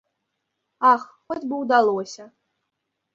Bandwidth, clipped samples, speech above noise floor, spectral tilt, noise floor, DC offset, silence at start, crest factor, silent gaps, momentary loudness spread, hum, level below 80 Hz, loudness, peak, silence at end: 7.8 kHz; under 0.1%; 58 dB; -4.5 dB/octave; -79 dBFS; under 0.1%; 0.8 s; 20 dB; none; 15 LU; none; -72 dBFS; -21 LUFS; -4 dBFS; 0.9 s